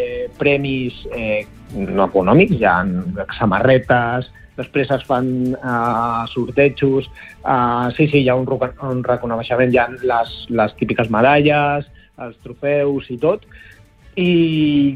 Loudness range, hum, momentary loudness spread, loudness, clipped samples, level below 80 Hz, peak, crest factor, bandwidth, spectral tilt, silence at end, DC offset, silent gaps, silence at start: 2 LU; none; 12 LU; -17 LUFS; under 0.1%; -42 dBFS; -2 dBFS; 14 dB; 10 kHz; -8.5 dB/octave; 0 s; under 0.1%; none; 0 s